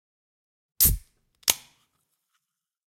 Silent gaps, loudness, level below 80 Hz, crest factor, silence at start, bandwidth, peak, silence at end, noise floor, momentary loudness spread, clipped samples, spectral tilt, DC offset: none; -23 LUFS; -40 dBFS; 30 dB; 0.8 s; 16.5 kHz; 0 dBFS; 1.35 s; -80 dBFS; 12 LU; under 0.1%; -1 dB/octave; under 0.1%